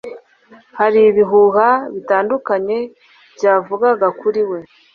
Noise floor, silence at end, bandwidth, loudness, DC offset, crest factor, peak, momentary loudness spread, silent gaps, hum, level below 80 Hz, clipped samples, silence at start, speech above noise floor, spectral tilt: -47 dBFS; 0.3 s; 6.6 kHz; -15 LUFS; under 0.1%; 14 dB; -2 dBFS; 11 LU; none; none; -62 dBFS; under 0.1%; 0.05 s; 33 dB; -6.5 dB/octave